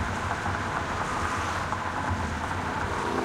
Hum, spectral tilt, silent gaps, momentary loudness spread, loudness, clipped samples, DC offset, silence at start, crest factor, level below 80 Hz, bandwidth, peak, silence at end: none; -5 dB/octave; none; 2 LU; -29 LUFS; under 0.1%; under 0.1%; 0 s; 16 dB; -44 dBFS; 15.5 kHz; -14 dBFS; 0 s